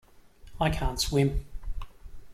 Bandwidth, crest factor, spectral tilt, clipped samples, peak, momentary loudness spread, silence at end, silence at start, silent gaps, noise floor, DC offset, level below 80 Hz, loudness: 16.5 kHz; 18 dB; -5 dB/octave; under 0.1%; -12 dBFS; 18 LU; 0 s; 0.15 s; none; -50 dBFS; under 0.1%; -36 dBFS; -28 LUFS